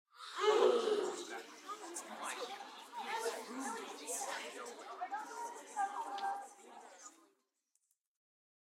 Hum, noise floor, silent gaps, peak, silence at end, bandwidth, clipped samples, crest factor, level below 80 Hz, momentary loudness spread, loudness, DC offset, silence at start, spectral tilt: none; -83 dBFS; none; -18 dBFS; 1.6 s; 16 kHz; under 0.1%; 24 dB; under -90 dBFS; 17 LU; -40 LUFS; under 0.1%; 0.15 s; -1 dB/octave